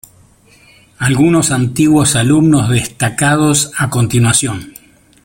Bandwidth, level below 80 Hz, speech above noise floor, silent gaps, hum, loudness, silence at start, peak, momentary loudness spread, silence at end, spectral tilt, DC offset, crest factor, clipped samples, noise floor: 17 kHz; -42 dBFS; 35 dB; none; none; -12 LUFS; 1 s; 0 dBFS; 6 LU; 0.55 s; -4.5 dB/octave; under 0.1%; 14 dB; under 0.1%; -46 dBFS